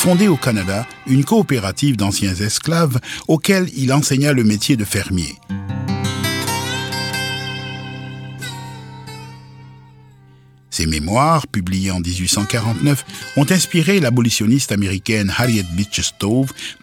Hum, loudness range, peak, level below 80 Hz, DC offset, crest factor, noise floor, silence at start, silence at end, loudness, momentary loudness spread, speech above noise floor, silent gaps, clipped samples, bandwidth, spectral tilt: none; 9 LU; -2 dBFS; -42 dBFS; under 0.1%; 16 dB; -47 dBFS; 0 s; 0.1 s; -17 LUFS; 14 LU; 30 dB; none; under 0.1%; 17.5 kHz; -4.5 dB/octave